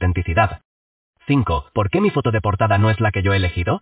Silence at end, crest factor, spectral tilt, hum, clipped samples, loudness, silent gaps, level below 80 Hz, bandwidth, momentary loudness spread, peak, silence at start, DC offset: 0.05 s; 16 dB; -11 dB/octave; none; under 0.1%; -19 LUFS; 0.65-1.14 s; -30 dBFS; 4 kHz; 5 LU; -2 dBFS; 0 s; under 0.1%